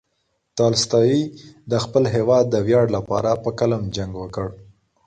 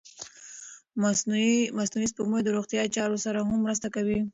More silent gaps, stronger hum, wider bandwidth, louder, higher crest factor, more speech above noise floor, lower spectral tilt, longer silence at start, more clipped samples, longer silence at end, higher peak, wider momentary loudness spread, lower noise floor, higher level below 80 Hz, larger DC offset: neither; neither; first, 9.2 kHz vs 8 kHz; first, -20 LUFS vs -27 LUFS; about the same, 16 dB vs 14 dB; first, 51 dB vs 20 dB; first, -5.5 dB/octave vs -4 dB/octave; first, 0.55 s vs 0.05 s; neither; first, 0.45 s vs 0.05 s; first, -4 dBFS vs -14 dBFS; second, 12 LU vs 18 LU; first, -71 dBFS vs -47 dBFS; first, -48 dBFS vs -62 dBFS; neither